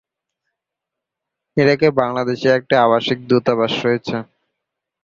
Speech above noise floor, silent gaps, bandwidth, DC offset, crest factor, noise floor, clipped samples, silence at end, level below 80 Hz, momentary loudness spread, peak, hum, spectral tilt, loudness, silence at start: 67 dB; none; 7.4 kHz; under 0.1%; 18 dB; -83 dBFS; under 0.1%; 0.8 s; -58 dBFS; 8 LU; -2 dBFS; none; -6.5 dB/octave; -17 LUFS; 1.55 s